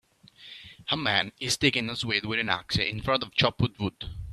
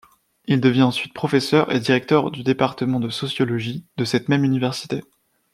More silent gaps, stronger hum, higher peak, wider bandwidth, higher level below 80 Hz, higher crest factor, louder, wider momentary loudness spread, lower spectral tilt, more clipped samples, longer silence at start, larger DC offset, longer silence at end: neither; neither; second, -6 dBFS vs -2 dBFS; about the same, 13.5 kHz vs 13.5 kHz; first, -50 dBFS vs -62 dBFS; about the same, 22 dB vs 18 dB; second, -26 LUFS vs -21 LUFS; first, 16 LU vs 9 LU; second, -4 dB/octave vs -6 dB/octave; neither; about the same, 0.4 s vs 0.5 s; neither; second, 0 s vs 0.5 s